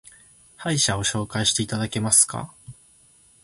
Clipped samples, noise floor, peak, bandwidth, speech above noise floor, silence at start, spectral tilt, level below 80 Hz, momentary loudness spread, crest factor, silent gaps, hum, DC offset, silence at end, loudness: under 0.1%; -56 dBFS; -4 dBFS; 12 kHz; 33 dB; 0.6 s; -2.5 dB/octave; -50 dBFS; 15 LU; 22 dB; none; none; under 0.1%; 0.7 s; -21 LUFS